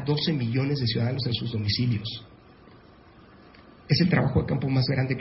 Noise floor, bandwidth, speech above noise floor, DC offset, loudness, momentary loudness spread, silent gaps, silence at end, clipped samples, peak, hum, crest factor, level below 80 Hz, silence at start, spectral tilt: -52 dBFS; 5.8 kHz; 27 dB; under 0.1%; -25 LUFS; 6 LU; none; 0 s; under 0.1%; -8 dBFS; none; 18 dB; -46 dBFS; 0 s; -10 dB/octave